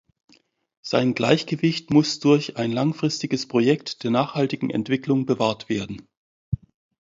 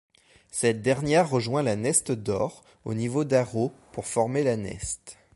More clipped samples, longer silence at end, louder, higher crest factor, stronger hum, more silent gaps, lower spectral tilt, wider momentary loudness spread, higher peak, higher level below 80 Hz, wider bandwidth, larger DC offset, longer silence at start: neither; first, 0.45 s vs 0.2 s; first, -23 LUFS vs -26 LUFS; about the same, 22 dB vs 20 dB; neither; first, 6.17-6.52 s vs none; about the same, -6 dB/octave vs -5 dB/octave; about the same, 12 LU vs 11 LU; first, -2 dBFS vs -8 dBFS; about the same, -52 dBFS vs -54 dBFS; second, 7.8 kHz vs 12 kHz; neither; first, 0.85 s vs 0.55 s